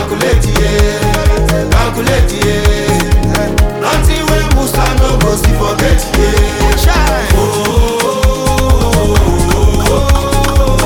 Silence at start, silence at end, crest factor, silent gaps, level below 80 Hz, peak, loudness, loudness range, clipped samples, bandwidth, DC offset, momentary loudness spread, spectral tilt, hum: 0 s; 0 s; 10 dB; none; -14 dBFS; 0 dBFS; -11 LUFS; 1 LU; under 0.1%; 18.5 kHz; under 0.1%; 2 LU; -5 dB/octave; none